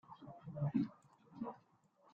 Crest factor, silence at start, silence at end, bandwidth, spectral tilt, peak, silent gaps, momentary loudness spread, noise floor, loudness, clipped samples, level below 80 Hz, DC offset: 20 dB; 0.1 s; 0.55 s; 7 kHz; -10 dB/octave; -24 dBFS; none; 20 LU; -72 dBFS; -43 LUFS; under 0.1%; -76 dBFS; under 0.1%